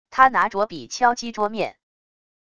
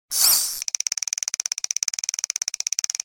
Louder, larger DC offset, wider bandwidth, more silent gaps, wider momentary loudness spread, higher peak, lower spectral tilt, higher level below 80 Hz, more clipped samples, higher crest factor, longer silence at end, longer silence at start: about the same, -21 LUFS vs -22 LUFS; first, 0.5% vs under 0.1%; second, 11 kHz vs over 20 kHz; neither; first, 11 LU vs 8 LU; about the same, 0 dBFS vs -2 dBFS; first, -3 dB/octave vs 4 dB/octave; first, -60 dBFS vs -66 dBFS; neither; about the same, 22 dB vs 22 dB; first, 0.8 s vs 0.55 s; about the same, 0.1 s vs 0.1 s